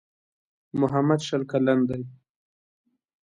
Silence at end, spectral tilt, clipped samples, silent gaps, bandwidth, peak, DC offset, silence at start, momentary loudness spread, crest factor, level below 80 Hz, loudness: 1.1 s; -7 dB/octave; under 0.1%; none; 10.5 kHz; -8 dBFS; under 0.1%; 0.75 s; 12 LU; 18 dB; -62 dBFS; -25 LUFS